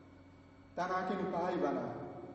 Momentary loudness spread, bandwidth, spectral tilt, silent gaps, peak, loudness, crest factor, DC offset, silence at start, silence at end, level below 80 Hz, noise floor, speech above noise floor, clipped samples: 10 LU; 8 kHz; -5.5 dB/octave; none; -20 dBFS; -37 LUFS; 18 dB; under 0.1%; 0 s; 0 s; -70 dBFS; -59 dBFS; 22 dB; under 0.1%